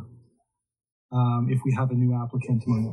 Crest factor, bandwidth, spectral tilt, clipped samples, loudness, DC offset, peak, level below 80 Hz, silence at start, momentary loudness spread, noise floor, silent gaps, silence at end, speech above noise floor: 14 dB; 6.4 kHz; -9.5 dB/octave; under 0.1%; -25 LUFS; under 0.1%; -12 dBFS; -62 dBFS; 0 s; 4 LU; -73 dBFS; 0.92-1.09 s; 0 s; 50 dB